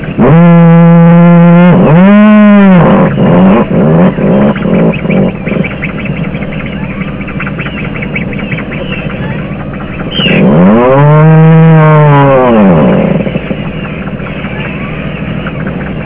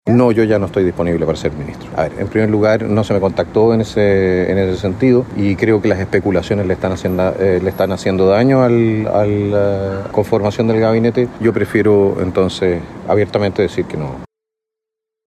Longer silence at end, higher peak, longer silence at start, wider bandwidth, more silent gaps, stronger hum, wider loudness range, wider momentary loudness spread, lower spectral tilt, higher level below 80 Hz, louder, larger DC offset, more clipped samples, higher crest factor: second, 0 s vs 1.05 s; about the same, 0 dBFS vs -2 dBFS; about the same, 0 s vs 0.05 s; second, 3.8 kHz vs 12.5 kHz; neither; neither; first, 12 LU vs 2 LU; first, 14 LU vs 7 LU; first, -12 dB/octave vs -7.5 dB/octave; first, -28 dBFS vs -42 dBFS; first, -6 LUFS vs -15 LUFS; neither; neither; second, 6 dB vs 14 dB